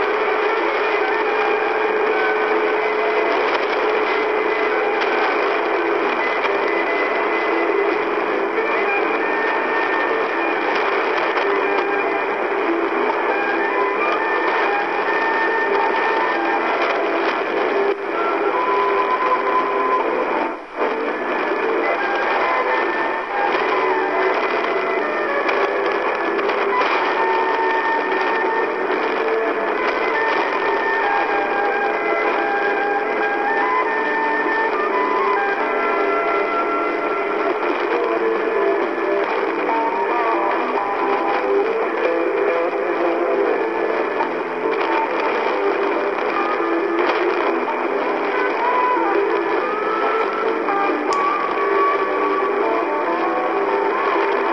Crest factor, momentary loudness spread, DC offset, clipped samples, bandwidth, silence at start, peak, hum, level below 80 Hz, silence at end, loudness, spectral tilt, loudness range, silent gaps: 14 dB; 2 LU; 0.2%; under 0.1%; 7.6 kHz; 0 s; -4 dBFS; none; -62 dBFS; 0 s; -19 LUFS; -4.5 dB/octave; 1 LU; none